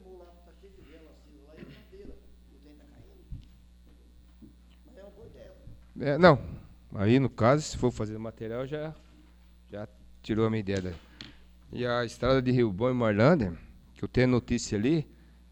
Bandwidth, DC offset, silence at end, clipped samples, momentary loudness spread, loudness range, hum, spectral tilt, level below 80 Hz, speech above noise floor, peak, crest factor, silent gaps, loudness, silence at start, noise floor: 19.5 kHz; under 0.1%; 0.5 s; under 0.1%; 25 LU; 8 LU; none; -6.5 dB/octave; -50 dBFS; 29 dB; -4 dBFS; 26 dB; none; -27 LUFS; 0.05 s; -55 dBFS